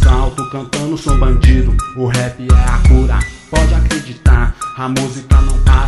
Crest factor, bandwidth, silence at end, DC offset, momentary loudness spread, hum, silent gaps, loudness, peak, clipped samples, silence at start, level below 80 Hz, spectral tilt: 10 dB; 12 kHz; 0 s; under 0.1%; 8 LU; none; none; -14 LUFS; 0 dBFS; under 0.1%; 0 s; -12 dBFS; -6 dB/octave